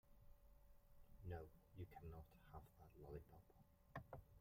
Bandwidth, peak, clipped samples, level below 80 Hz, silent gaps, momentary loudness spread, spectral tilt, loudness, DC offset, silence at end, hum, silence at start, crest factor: 16 kHz; -40 dBFS; under 0.1%; -68 dBFS; none; 8 LU; -8 dB/octave; -61 LUFS; under 0.1%; 0 s; none; 0.05 s; 20 dB